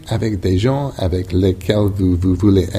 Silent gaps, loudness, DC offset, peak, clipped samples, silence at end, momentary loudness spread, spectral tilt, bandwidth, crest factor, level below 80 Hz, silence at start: none; -17 LUFS; under 0.1%; 0 dBFS; under 0.1%; 0 s; 6 LU; -7.5 dB/octave; 13.5 kHz; 16 dB; -32 dBFS; 0 s